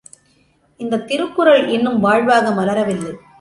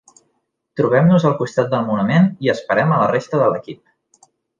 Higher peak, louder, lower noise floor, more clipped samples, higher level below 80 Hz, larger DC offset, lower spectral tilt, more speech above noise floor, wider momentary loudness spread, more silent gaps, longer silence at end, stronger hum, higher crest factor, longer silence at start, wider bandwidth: about the same, -2 dBFS vs -2 dBFS; about the same, -16 LUFS vs -17 LUFS; second, -57 dBFS vs -69 dBFS; neither; about the same, -58 dBFS vs -60 dBFS; neither; second, -5.5 dB/octave vs -8 dB/octave; second, 42 dB vs 53 dB; first, 11 LU vs 8 LU; neither; second, 0.25 s vs 0.85 s; neither; about the same, 16 dB vs 14 dB; about the same, 0.8 s vs 0.75 s; first, 11.5 kHz vs 7.6 kHz